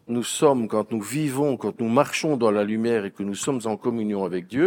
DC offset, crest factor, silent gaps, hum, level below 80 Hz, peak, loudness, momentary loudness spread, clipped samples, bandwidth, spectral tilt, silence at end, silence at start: under 0.1%; 20 dB; none; none; -72 dBFS; -4 dBFS; -24 LUFS; 7 LU; under 0.1%; over 20 kHz; -5 dB/octave; 0 s; 0.1 s